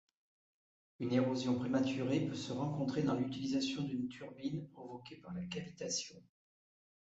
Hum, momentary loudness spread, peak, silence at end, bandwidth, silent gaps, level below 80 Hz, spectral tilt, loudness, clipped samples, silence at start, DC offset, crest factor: none; 13 LU; -20 dBFS; 0.8 s; 8 kHz; none; -72 dBFS; -6 dB/octave; -38 LUFS; under 0.1%; 1 s; under 0.1%; 18 dB